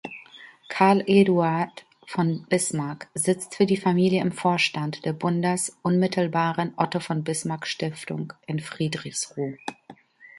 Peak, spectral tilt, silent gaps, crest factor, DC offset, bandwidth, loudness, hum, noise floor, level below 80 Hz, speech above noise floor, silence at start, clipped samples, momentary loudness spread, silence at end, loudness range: -4 dBFS; -5 dB/octave; none; 20 dB; under 0.1%; 11.5 kHz; -24 LUFS; none; -50 dBFS; -68 dBFS; 26 dB; 0.05 s; under 0.1%; 12 LU; 0 s; 6 LU